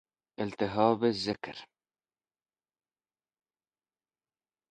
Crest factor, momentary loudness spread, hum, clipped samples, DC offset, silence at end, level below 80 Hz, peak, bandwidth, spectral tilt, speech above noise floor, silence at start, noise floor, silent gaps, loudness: 24 dB; 15 LU; none; under 0.1%; under 0.1%; 3.05 s; -68 dBFS; -10 dBFS; 10 kHz; -6 dB/octave; over 60 dB; 0.4 s; under -90 dBFS; none; -30 LUFS